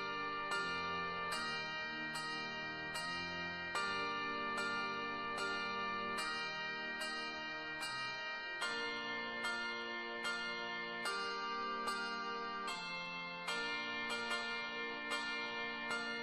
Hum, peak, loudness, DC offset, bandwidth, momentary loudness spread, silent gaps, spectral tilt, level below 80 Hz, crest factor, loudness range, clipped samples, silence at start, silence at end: none; -26 dBFS; -40 LUFS; under 0.1%; 12.5 kHz; 3 LU; none; -2.5 dB/octave; -72 dBFS; 16 dB; 1 LU; under 0.1%; 0 s; 0 s